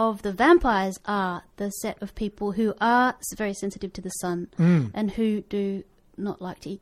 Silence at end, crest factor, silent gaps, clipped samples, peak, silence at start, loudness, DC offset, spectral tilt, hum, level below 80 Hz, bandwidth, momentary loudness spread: 0.05 s; 20 dB; none; under 0.1%; -6 dBFS; 0 s; -25 LUFS; under 0.1%; -6 dB/octave; none; -46 dBFS; 15 kHz; 13 LU